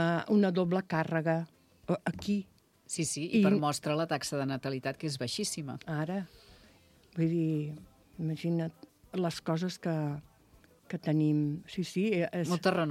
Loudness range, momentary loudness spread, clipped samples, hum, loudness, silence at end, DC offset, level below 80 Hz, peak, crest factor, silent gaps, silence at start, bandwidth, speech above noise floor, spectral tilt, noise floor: 4 LU; 12 LU; under 0.1%; none; -32 LUFS; 0 s; under 0.1%; -68 dBFS; -14 dBFS; 20 dB; none; 0 s; 15 kHz; 31 dB; -5.5 dB/octave; -62 dBFS